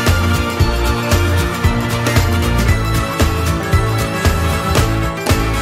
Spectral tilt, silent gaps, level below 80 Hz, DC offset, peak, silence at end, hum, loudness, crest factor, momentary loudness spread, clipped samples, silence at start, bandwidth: -5 dB/octave; none; -20 dBFS; under 0.1%; 0 dBFS; 0 s; none; -16 LUFS; 14 dB; 3 LU; under 0.1%; 0 s; 16.5 kHz